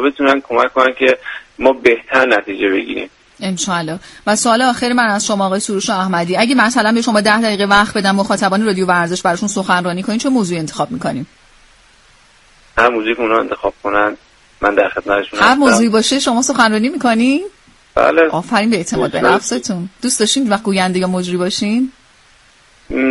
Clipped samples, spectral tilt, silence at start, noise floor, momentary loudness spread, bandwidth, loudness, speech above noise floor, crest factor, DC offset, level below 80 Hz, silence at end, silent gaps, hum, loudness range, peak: under 0.1%; -4 dB/octave; 0 s; -48 dBFS; 9 LU; 11.5 kHz; -14 LUFS; 34 dB; 14 dB; under 0.1%; -46 dBFS; 0 s; none; none; 5 LU; 0 dBFS